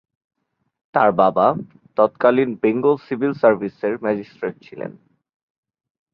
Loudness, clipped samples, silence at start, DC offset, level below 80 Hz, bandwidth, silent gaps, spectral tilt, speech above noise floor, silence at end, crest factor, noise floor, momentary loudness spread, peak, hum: -19 LUFS; under 0.1%; 0.95 s; under 0.1%; -64 dBFS; 5.6 kHz; none; -9.5 dB/octave; 55 dB; 1.2 s; 20 dB; -73 dBFS; 14 LU; -2 dBFS; none